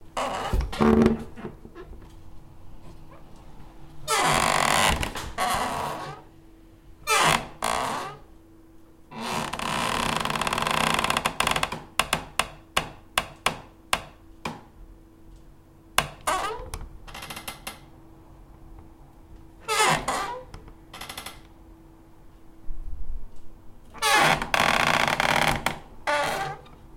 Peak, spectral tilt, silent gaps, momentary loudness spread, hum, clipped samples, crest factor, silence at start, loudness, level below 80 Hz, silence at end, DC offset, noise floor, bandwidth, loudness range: -2 dBFS; -3 dB/octave; none; 21 LU; none; under 0.1%; 26 dB; 0 s; -25 LUFS; -42 dBFS; 0 s; under 0.1%; -50 dBFS; 17 kHz; 10 LU